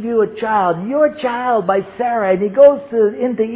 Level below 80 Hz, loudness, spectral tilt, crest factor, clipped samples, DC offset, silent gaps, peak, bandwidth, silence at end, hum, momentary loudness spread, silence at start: -58 dBFS; -15 LUFS; -10 dB/octave; 14 dB; under 0.1%; under 0.1%; none; 0 dBFS; 4 kHz; 0 s; none; 8 LU; 0 s